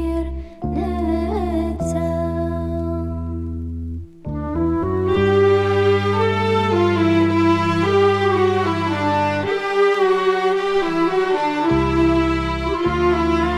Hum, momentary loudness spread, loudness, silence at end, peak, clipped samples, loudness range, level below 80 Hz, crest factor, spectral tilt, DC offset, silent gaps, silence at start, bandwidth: none; 10 LU; -19 LUFS; 0 s; -4 dBFS; under 0.1%; 7 LU; -32 dBFS; 14 dB; -7 dB/octave; under 0.1%; none; 0 s; 11.5 kHz